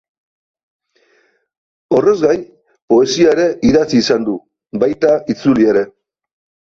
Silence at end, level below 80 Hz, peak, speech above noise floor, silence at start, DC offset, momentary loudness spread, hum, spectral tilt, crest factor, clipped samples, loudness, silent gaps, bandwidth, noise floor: 0.8 s; -48 dBFS; -2 dBFS; 45 dB; 1.9 s; under 0.1%; 8 LU; none; -5.5 dB/octave; 14 dB; under 0.1%; -14 LUFS; 2.82-2.88 s; 7.6 kHz; -58 dBFS